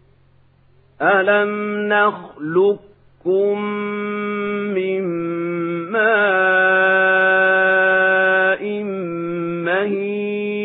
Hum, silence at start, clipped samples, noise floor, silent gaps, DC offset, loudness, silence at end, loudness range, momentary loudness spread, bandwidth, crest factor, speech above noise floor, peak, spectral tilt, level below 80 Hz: none; 1 s; under 0.1%; -53 dBFS; none; under 0.1%; -17 LUFS; 0 s; 6 LU; 10 LU; 4 kHz; 16 dB; 35 dB; -2 dBFS; -10.5 dB/octave; -66 dBFS